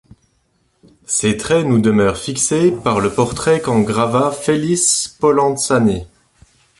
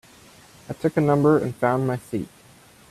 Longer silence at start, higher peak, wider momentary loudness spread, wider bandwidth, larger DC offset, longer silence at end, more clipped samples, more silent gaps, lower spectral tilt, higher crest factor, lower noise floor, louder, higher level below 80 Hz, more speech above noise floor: first, 1.1 s vs 0.7 s; about the same, -2 dBFS vs -4 dBFS; second, 4 LU vs 14 LU; second, 11.5 kHz vs 14 kHz; neither; about the same, 0.75 s vs 0.65 s; neither; neither; second, -4.5 dB/octave vs -8 dB/octave; about the same, 14 dB vs 18 dB; first, -62 dBFS vs -51 dBFS; first, -15 LUFS vs -22 LUFS; first, -44 dBFS vs -58 dBFS; first, 47 dB vs 30 dB